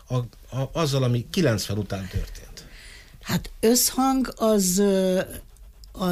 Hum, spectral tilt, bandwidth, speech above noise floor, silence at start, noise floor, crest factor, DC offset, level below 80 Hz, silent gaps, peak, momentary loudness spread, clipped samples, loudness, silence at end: none; -4.5 dB/octave; 15.5 kHz; 21 dB; 0.1 s; -45 dBFS; 14 dB; under 0.1%; -42 dBFS; none; -10 dBFS; 21 LU; under 0.1%; -23 LUFS; 0 s